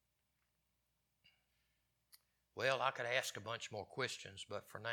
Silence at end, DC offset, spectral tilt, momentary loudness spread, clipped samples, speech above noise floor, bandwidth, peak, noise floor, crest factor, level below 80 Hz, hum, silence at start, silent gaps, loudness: 0 s; under 0.1%; -2.5 dB/octave; 12 LU; under 0.1%; 42 dB; 19 kHz; -20 dBFS; -85 dBFS; 26 dB; -86 dBFS; none; 2.55 s; none; -41 LUFS